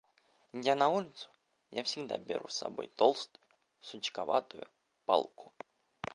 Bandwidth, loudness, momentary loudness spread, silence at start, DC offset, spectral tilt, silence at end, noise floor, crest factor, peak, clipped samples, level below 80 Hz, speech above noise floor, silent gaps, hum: 11 kHz; -34 LUFS; 22 LU; 0.55 s; under 0.1%; -3.5 dB/octave; 0.1 s; -71 dBFS; 24 dB; -12 dBFS; under 0.1%; -78 dBFS; 37 dB; none; none